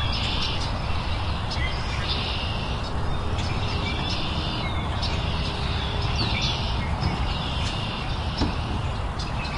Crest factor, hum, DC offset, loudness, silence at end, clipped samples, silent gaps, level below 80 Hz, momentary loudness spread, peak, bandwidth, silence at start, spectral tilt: 14 dB; none; under 0.1%; -27 LUFS; 0 s; under 0.1%; none; -32 dBFS; 4 LU; -12 dBFS; 11.5 kHz; 0 s; -5 dB/octave